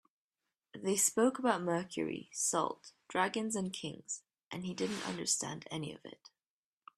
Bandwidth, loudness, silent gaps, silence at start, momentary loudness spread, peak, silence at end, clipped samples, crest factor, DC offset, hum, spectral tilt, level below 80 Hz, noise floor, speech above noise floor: 15.5 kHz; -35 LUFS; 4.46-4.51 s; 0.75 s; 14 LU; -14 dBFS; 0.85 s; under 0.1%; 22 dB; under 0.1%; none; -3 dB/octave; -78 dBFS; under -90 dBFS; over 54 dB